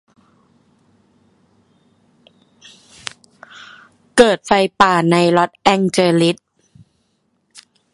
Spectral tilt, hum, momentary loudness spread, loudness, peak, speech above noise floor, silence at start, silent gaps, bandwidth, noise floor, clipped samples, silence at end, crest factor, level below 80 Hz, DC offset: -5 dB/octave; none; 20 LU; -14 LUFS; 0 dBFS; 51 dB; 4.15 s; none; 11.5 kHz; -65 dBFS; under 0.1%; 1.6 s; 18 dB; -52 dBFS; under 0.1%